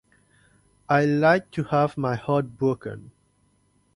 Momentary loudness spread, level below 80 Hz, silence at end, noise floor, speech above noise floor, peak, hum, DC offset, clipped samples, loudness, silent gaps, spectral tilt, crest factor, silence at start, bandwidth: 12 LU; -60 dBFS; 0.9 s; -65 dBFS; 42 dB; -6 dBFS; 50 Hz at -45 dBFS; under 0.1%; under 0.1%; -23 LUFS; none; -8 dB/octave; 20 dB; 0.9 s; 11 kHz